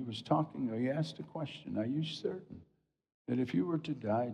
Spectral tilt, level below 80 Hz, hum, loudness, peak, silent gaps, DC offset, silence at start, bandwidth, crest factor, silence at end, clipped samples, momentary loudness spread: -7.5 dB/octave; -76 dBFS; none; -36 LUFS; -18 dBFS; 3.14-3.25 s; under 0.1%; 0 s; 10 kHz; 18 dB; 0 s; under 0.1%; 11 LU